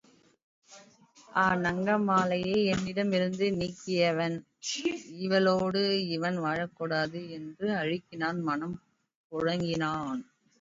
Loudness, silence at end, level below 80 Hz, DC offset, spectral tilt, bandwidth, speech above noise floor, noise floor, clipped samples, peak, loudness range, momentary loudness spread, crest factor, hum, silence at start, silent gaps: -30 LUFS; 0.4 s; -62 dBFS; under 0.1%; -5.5 dB/octave; 7.8 kHz; 29 dB; -58 dBFS; under 0.1%; -12 dBFS; 5 LU; 9 LU; 18 dB; none; 0.7 s; 9.15-9.30 s